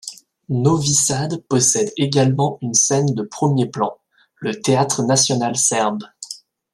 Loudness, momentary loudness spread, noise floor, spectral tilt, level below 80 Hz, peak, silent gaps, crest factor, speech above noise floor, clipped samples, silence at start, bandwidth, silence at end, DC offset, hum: -17 LUFS; 13 LU; -38 dBFS; -4 dB/octave; -58 dBFS; -2 dBFS; none; 16 dB; 20 dB; under 0.1%; 0.05 s; 13.5 kHz; 0.4 s; under 0.1%; none